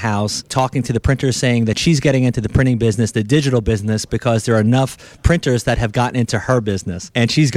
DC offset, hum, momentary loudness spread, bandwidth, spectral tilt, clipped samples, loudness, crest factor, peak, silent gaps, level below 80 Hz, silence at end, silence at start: under 0.1%; none; 5 LU; 14 kHz; -5.5 dB/octave; under 0.1%; -17 LUFS; 16 dB; 0 dBFS; none; -32 dBFS; 0 s; 0 s